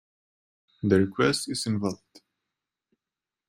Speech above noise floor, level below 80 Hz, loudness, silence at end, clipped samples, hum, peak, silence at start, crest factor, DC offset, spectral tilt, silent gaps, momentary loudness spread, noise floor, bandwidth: 64 dB; -64 dBFS; -26 LUFS; 1.55 s; under 0.1%; none; -6 dBFS; 0.85 s; 22 dB; under 0.1%; -5 dB/octave; none; 10 LU; -90 dBFS; 16 kHz